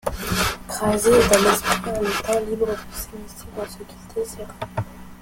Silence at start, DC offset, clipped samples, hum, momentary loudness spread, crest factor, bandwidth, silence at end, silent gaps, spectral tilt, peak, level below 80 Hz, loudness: 0.05 s; under 0.1%; under 0.1%; none; 18 LU; 22 dB; 17 kHz; 0 s; none; -3.5 dB/octave; 0 dBFS; -40 dBFS; -21 LUFS